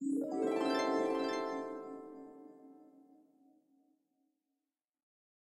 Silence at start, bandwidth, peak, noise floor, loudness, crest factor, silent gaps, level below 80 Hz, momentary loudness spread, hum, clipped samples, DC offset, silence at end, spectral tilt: 0 s; 13.5 kHz; -22 dBFS; under -90 dBFS; -36 LUFS; 18 dB; none; -88 dBFS; 22 LU; none; under 0.1%; under 0.1%; 2.55 s; -4.5 dB/octave